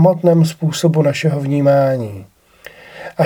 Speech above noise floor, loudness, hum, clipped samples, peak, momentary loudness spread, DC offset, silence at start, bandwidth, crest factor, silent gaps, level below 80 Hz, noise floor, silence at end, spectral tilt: 27 dB; -15 LUFS; none; under 0.1%; 0 dBFS; 19 LU; under 0.1%; 0 s; 16.5 kHz; 14 dB; none; -60 dBFS; -41 dBFS; 0 s; -7 dB/octave